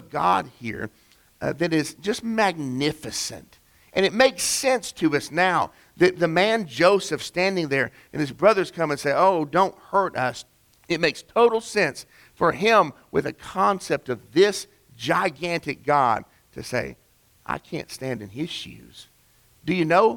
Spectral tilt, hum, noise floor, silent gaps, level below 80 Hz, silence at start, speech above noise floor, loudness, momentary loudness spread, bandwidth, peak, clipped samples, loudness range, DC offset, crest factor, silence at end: -4 dB/octave; none; -59 dBFS; none; -58 dBFS; 0 s; 36 dB; -23 LUFS; 13 LU; 19 kHz; -4 dBFS; under 0.1%; 6 LU; under 0.1%; 20 dB; 0 s